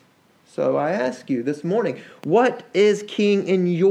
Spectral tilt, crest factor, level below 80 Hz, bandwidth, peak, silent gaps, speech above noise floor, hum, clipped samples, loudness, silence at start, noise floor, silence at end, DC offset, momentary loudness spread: -6.5 dB/octave; 14 dB; -76 dBFS; 10 kHz; -6 dBFS; none; 37 dB; none; under 0.1%; -21 LUFS; 0.6 s; -57 dBFS; 0 s; under 0.1%; 7 LU